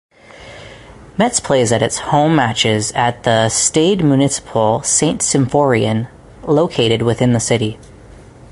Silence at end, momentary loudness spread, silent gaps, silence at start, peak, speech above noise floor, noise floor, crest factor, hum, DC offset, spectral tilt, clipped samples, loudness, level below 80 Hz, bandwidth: 0.45 s; 10 LU; none; 0.4 s; 0 dBFS; 25 dB; -39 dBFS; 16 dB; none; under 0.1%; -4 dB/octave; under 0.1%; -14 LUFS; -44 dBFS; 11.5 kHz